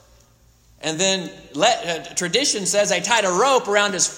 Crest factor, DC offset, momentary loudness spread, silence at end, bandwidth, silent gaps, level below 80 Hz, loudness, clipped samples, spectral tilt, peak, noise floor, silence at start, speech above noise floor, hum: 18 dB; under 0.1%; 8 LU; 0 s; 16.5 kHz; none; -58 dBFS; -19 LUFS; under 0.1%; -1.5 dB/octave; -2 dBFS; -55 dBFS; 0.8 s; 35 dB; none